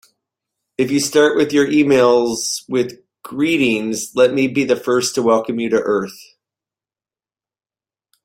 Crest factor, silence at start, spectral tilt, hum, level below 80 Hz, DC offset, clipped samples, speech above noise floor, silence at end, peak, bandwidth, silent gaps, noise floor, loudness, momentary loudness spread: 16 dB; 0.8 s; -4 dB/octave; none; -60 dBFS; under 0.1%; under 0.1%; over 74 dB; 2 s; -2 dBFS; 16.5 kHz; none; under -90 dBFS; -16 LUFS; 8 LU